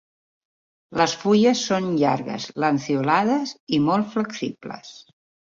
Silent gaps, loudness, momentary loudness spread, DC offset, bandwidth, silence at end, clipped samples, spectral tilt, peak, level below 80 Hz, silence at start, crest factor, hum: 3.60-3.67 s; -22 LUFS; 13 LU; under 0.1%; 7.6 kHz; 0.55 s; under 0.1%; -5 dB/octave; -4 dBFS; -64 dBFS; 0.9 s; 20 dB; none